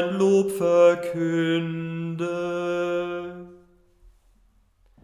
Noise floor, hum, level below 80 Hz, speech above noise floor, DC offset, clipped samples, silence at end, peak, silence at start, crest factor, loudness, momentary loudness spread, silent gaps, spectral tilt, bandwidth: -61 dBFS; none; -62 dBFS; 38 dB; under 0.1%; under 0.1%; 1.5 s; -8 dBFS; 0 s; 18 dB; -23 LUFS; 13 LU; none; -6.5 dB/octave; 15.5 kHz